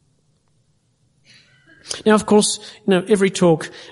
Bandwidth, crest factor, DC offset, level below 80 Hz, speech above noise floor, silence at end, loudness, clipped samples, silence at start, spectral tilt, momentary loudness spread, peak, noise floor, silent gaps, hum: 11.5 kHz; 18 dB; under 0.1%; -58 dBFS; 46 dB; 0.05 s; -17 LUFS; under 0.1%; 1.85 s; -4.5 dB/octave; 8 LU; -2 dBFS; -62 dBFS; none; none